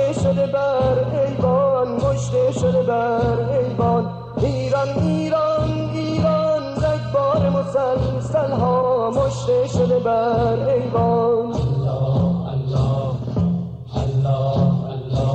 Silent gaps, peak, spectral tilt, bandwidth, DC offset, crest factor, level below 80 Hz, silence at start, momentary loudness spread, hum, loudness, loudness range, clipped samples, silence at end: none; -8 dBFS; -8 dB/octave; 8.8 kHz; under 0.1%; 10 dB; -38 dBFS; 0 s; 4 LU; none; -20 LUFS; 2 LU; under 0.1%; 0 s